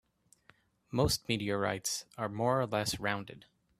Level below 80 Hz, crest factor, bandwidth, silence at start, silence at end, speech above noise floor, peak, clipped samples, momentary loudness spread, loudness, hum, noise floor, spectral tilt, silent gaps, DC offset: -56 dBFS; 20 dB; 15.5 kHz; 0.9 s; 0.4 s; 33 dB; -14 dBFS; under 0.1%; 8 LU; -33 LUFS; none; -67 dBFS; -4 dB/octave; none; under 0.1%